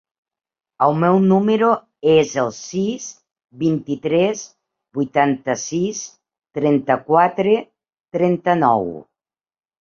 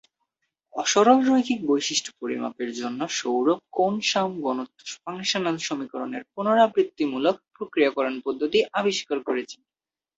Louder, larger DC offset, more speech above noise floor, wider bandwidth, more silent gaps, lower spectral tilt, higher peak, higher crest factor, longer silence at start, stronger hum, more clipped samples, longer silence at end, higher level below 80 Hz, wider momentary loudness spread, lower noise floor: first, -18 LUFS vs -24 LUFS; neither; first, over 73 dB vs 54 dB; about the same, 7.4 kHz vs 8 kHz; first, 8.00-8.04 s vs none; first, -6 dB/octave vs -3.5 dB/octave; about the same, -2 dBFS vs -4 dBFS; about the same, 18 dB vs 20 dB; about the same, 0.8 s vs 0.75 s; neither; neither; first, 0.8 s vs 0.65 s; first, -60 dBFS vs -70 dBFS; first, 15 LU vs 12 LU; first, under -90 dBFS vs -78 dBFS